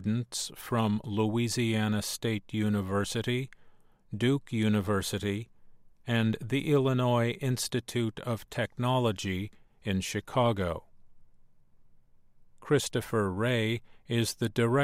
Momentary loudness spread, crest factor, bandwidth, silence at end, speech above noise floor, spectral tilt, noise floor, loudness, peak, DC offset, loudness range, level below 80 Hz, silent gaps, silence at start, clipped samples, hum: 7 LU; 18 dB; 16 kHz; 0 s; 28 dB; -5.5 dB/octave; -57 dBFS; -30 LUFS; -12 dBFS; under 0.1%; 4 LU; -58 dBFS; none; 0 s; under 0.1%; none